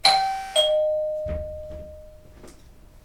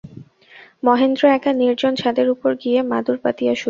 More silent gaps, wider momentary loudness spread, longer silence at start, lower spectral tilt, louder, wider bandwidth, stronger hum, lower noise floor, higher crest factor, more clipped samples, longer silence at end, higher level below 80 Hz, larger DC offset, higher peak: neither; first, 20 LU vs 6 LU; about the same, 0.05 s vs 0.05 s; second, -2 dB/octave vs -5.5 dB/octave; second, -23 LUFS vs -18 LUFS; first, 16 kHz vs 7.4 kHz; neither; about the same, -48 dBFS vs -47 dBFS; first, 22 dB vs 16 dB; neither; about the same, 0.05 s vs 0 s; first, -44 dBFS vs -62 dBFS; neither; about the same, -2 dBFS vs -2 dBFS